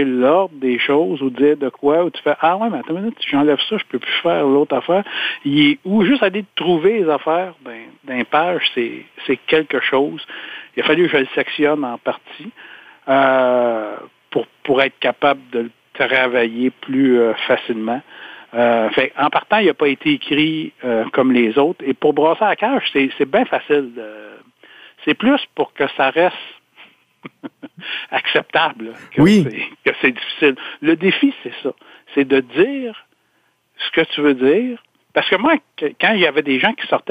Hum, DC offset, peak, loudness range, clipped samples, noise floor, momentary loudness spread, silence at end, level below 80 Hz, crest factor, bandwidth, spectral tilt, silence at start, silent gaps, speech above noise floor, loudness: none; under 0.1%; -2 dBFS; 3 LU; under 0.1%; -62 dBFS; 12 LU; 0 s; -60 dBFS; 16 dB; 10 kHz; -6.5 dB/octave; 0 s; none; 46 dB; -17 LUFS